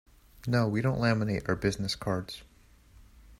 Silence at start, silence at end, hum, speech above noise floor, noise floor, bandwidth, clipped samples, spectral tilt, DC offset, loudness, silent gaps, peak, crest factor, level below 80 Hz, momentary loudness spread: 0.45 s; 0.05 s; none; 28 dB; -57 dBFS; 15.5 kHz; under 0.1%; -6 dB/octave; under 0.1%; -30 LUFS; none; -12 dBFS; 20 dB; -52 dBFS; 13 LU